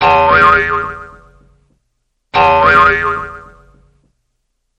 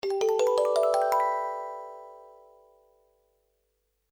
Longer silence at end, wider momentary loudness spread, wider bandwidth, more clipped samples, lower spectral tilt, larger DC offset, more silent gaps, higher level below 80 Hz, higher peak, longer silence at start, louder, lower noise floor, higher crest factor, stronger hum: second, 1.35 s vs 1.85 s; second, 16 LU vs 19 LU; second, 9.4 kHz vs over 20 kHz; neither; first, -5.5 dB/octave vs -2 dB/octave; neither; neither; first, -36 dBFS vs -76 dBFS; first, 0 dBFS vs -12 dBFS; about the same, 0 s vs 0.05 s; first, -10 LUFS vs -26 LUFS; second, -67 dBFS vs -76 dBFS; about the same, 14 dB vs 18 dB; second, none vs 50 Hz at -80 dBFS